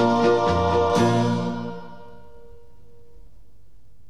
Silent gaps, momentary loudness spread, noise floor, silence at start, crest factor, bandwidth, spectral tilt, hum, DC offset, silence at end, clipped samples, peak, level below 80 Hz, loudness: none; 17 LU; -55 dBFS; 0 s; 16 dB; 12 kHz; -6.5 dB/octave; none; 1%; 2 s; under 0.1%; -8 dBFS; -46 dBFS; -21 LUFS